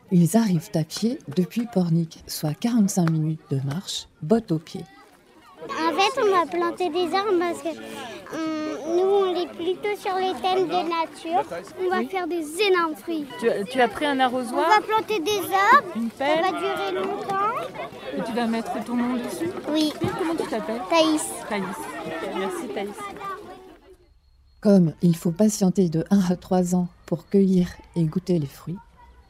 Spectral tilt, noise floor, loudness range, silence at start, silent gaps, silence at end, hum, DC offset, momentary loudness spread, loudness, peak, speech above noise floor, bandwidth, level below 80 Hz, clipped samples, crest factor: -5.5 dB/octave; -56 dBFS; 5 LU; 0.1 s; none; 0.5 s; none; under 0.1%; 12 LU; -24 LUFS; -4 dBFS; 33 dB; 16 kHz; -58 dBFS; under 0.1%; 20 dB